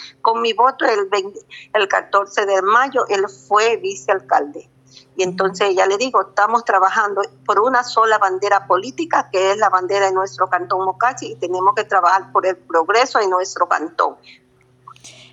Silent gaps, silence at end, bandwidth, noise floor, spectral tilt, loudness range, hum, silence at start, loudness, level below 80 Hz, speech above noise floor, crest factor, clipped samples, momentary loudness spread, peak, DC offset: none; 0.2 s; 8.8 kHz; -47 dBFS; -3 dB/octave; 2 LU; none; 0 s; -17 LUFS; -72 dBFS; 30 dB; 16 dB; under 0.1%; 6 LU; -2 dBFS; under 0.1%